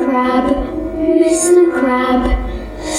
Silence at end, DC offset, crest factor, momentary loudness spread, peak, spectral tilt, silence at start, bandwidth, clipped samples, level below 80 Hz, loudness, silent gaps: 0 s; under 0.1%; 12 dB; 11 LU; 0 dBFS; -4.5 dB/octave; 0 s; 14.5 kHz; under 0.1%; -26 dBFS; -14 LUFS; none